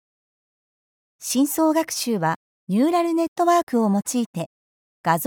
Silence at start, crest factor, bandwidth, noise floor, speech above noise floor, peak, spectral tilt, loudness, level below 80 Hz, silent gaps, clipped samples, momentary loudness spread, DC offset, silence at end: 1.2 s; 18 dB; over 20 kHz; under -90 dBFS; over 69 dB; -6 dBFS; -4.5 dB/octave; -22 LUFS; -70 dBFS; 2.36-2.67 s, 3.28-3.36 s, 3.63-3.67 s, 4.26-4.33 s, 4.46-5.04 s; under 0.1%; 11 LU; under 0.1%; 0 s